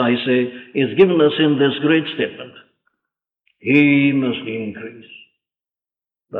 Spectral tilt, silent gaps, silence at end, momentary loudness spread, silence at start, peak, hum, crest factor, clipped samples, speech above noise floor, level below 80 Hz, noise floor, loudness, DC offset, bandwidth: -9 dB/octave; none; 0 s; 16 LU; 0 s; -2 dBFS; none; 18 dB; under 0.1%; over 73 dB; -66 dBFS; under -90 dBFS; -17 LUFS; under 0.1%; 4.3 kHz